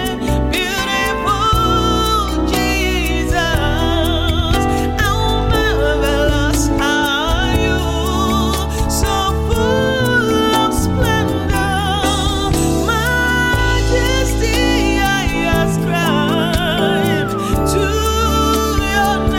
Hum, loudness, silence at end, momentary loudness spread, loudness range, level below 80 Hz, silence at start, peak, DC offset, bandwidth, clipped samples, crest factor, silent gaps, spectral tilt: none; -15 LUFS; 0 s; 3 LU; 1 LU; -22 dBFS; 0 s; -2 dBFS; under 0.1%; 17 kHz; under 0.1%; 12 dB; none; -4.5 dB/octave